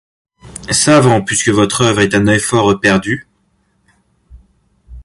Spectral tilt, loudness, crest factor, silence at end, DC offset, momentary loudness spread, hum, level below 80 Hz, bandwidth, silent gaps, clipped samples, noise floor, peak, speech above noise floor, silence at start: -4 dB/octave; -12 LUFS; 14 dB; 0.05 s; under 0.1%; 12 LU; none; -40 dBFS; 11.5 kHz; none; under 0.1%; -59 dBFS; 0 dBFS; 48 dB; 0.45 s